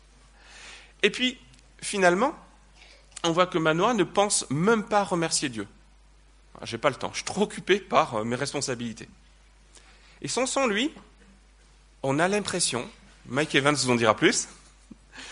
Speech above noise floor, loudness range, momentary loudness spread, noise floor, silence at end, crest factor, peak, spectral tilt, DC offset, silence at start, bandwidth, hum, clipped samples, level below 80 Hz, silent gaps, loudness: 30 dB; 5 LU; 17 LU; -56 dBFS; 0 s; 22 dB; -4 dBFS; -3.5 dB/octave; under 0.1%; 0.5 s; 10.5 kHz; none; under 0.1%; -56 dBFS; none; -25 LUFS